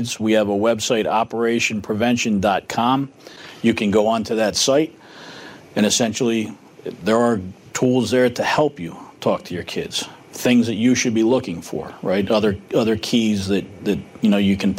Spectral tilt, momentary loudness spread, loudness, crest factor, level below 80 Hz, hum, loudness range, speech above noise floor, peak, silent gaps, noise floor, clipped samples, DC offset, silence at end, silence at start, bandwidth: -4.5 dB/octave; 13 LU; -19 LUFS; 14 dB; -54 dBFS; none; 2 LU; 20 dB; -6 dBFS; none; -39 dBFS; under 0.1%; under 0.1%; 0 s; 0 s; 16 kHz